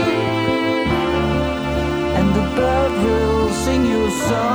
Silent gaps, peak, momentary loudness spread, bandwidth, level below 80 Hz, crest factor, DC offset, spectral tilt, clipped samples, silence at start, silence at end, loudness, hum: none; -6 dBFS; 3 LU; over 20 kHz; -30 dBFS; 12 dB; under 0.1%; -5.5 dB/octave; under 0.1%; 0 s; 0 s; -18 LUFS; none